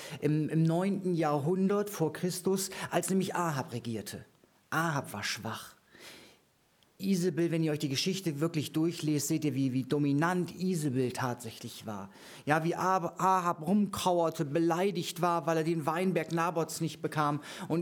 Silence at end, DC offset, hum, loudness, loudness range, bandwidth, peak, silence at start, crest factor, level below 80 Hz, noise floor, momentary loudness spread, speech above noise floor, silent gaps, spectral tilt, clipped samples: 0 s; under 0.1%; none; -31 LUFS; 5 LU; 19.5 kHz; -10 dBFS; 0 s; 20 dB; -72 dBFS; -68 dBFS; 11 LU; 37 dB; none; -5.5 dB/octave; under 0.1%